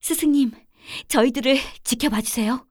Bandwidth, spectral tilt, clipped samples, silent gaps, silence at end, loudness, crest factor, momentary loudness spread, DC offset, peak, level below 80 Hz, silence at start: over 20 kHz; -3 dB/octave; under 0.1%; none; 0.1 s; -21 LUFS; 18 dB; 7 LU; under 0.1%; -4 dBFS; -48 dBFS; 0.05 s